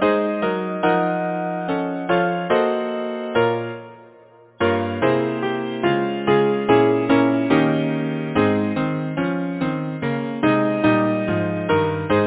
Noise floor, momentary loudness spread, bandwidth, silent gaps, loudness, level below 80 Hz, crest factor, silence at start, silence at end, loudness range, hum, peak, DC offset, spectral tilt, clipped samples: -48 dBFS; 7 LU; 4 kHz; none; -20 LUFS; -52 dBFS; 16 dB; 0 s; 0 s; 4 LU; none; -4 dBFS; under 0.1%; -11 dB/octave; under 0.1%